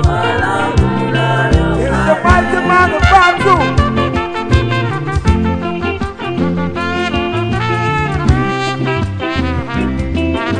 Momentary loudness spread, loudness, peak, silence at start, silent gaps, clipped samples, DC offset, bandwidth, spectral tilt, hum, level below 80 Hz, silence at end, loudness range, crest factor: 8 LU; -14 LUFS; 0 dBFS; 0 s; none; 0.2%; under 0.1%; 10 kHz; -6.5 dB/octave; none; -22 dBFS; 0 s; 5 LU; 14 dB